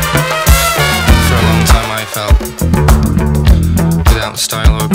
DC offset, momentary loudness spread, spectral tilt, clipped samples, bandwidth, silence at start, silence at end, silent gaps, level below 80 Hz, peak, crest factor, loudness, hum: under 0.1%; 4 LU; -4.5 dB/octave; 1%; 16.5 kHz; 0 s; 0 s; none; -14 dBFS; 0 dBFS; 10 dB; -11 LUFS; none